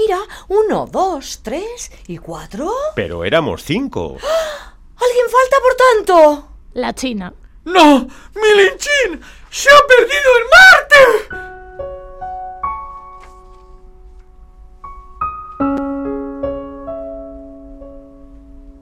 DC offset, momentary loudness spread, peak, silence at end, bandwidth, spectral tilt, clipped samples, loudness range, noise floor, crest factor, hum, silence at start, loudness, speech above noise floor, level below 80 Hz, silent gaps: under 0.1%; 22 LU; 0 dBFS; 0.1 s; 16.5 kHz; -3 dB/octave; under 0.1%; 18 LU; -40 dBFS; 14 dB; none; 0 s; -12 LUFS; 27 dB; -40 dBFS; none